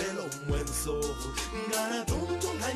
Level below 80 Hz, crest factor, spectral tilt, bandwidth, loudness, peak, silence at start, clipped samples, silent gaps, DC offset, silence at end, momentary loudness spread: -40 dBFS; 14 dB; -4 dB/octave; 15 kHz; -32 LUFS; -18 dBFS; 0 s; under 0.1%; none; under 0.1%; 0 s; 4 LU